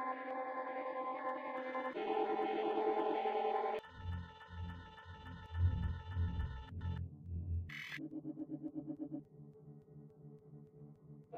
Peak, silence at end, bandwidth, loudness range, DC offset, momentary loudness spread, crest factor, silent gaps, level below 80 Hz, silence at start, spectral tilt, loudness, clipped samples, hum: -24 dBFS; 0 s; 6.4 kHz; 9 LU; under 0.1%; 21 LU; 18 dB; none; -52 dBFS; 0 s; -8 dB/octave; -41 LUFS; under 0.1%; none